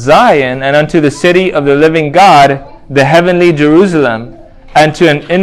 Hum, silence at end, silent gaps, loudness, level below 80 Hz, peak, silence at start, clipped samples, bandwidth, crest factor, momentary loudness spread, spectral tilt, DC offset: none; 0 s; none; -7 LUFS; -38 dBFS; 0 dBFS; 0 s; 3%; 14 kHz; 8 dB; 7 LU; -6 dB/octave; under 0.1%